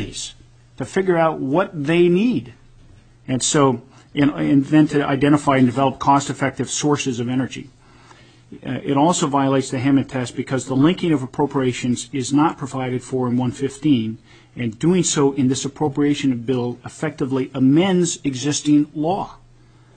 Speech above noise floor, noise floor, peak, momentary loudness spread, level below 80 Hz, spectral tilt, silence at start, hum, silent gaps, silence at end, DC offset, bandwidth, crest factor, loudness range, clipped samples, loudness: 30 dB; -49 dBFS; -2 dBFS; 11 LU; -52 dBFS; -5.5 dB/octave; 0 s; none; none; 0.65 s; under 0.1%; 9.4 kHz; 18 dB; 4 LU; under 0.1%; -19 LUFS